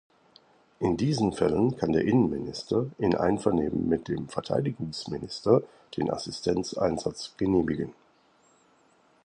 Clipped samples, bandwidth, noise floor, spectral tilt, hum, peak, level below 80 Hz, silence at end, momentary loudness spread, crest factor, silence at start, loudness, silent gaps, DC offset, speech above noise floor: under 0.1%; 10.5 kHz; -63 dBFS; -6.5 dB/octave; none; -8 dBFS; -52 dBFS; 1.3 s; 9 LU; 20 dB; 0.8 s; -28 LUFS; none; under 0.1%; 36 dB